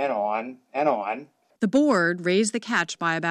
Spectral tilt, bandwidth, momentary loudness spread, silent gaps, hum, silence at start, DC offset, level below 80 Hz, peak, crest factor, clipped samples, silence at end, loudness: -4.5 dB/octave; 11.5 kHz; 10 LU; none; none; 0 s; under 0.1%; -70 dBFS; -10 dBFS; 14 dB; under 0.1%; 0 s; -24 LUFS